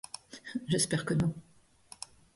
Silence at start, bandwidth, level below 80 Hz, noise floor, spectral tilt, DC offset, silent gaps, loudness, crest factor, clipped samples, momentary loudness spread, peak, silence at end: 0.3 s; 12 kHz; -62 dBFS; -57 dBFS; -4.5 dB/octave; under 0.1%; none; -32 LUFS; 20 dB; under 0.1%; 18 LU; -16 dBFS; 0.95 s